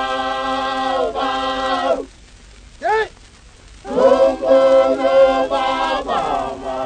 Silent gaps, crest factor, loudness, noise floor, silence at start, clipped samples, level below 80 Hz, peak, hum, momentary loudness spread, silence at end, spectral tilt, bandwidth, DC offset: none; 16 dB; -17 LUFS; -44 dBFS; 0 s; under 0.1%; -44 dBFS; -2 dBFS; none; 11 LU; 0 s; -4 dB/octave; 9.4 kHz; under 0.1%